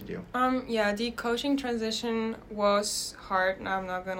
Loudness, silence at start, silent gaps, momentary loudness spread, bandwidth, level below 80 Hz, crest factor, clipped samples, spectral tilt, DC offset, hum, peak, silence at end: -29 LUFS; 0 s; none; 6 LU; 16 kHz; -56 dBFS; 16 dB; under 0.1%; -3.5 dB/octave; under 0.1%; none; -12 dBFS; 0 s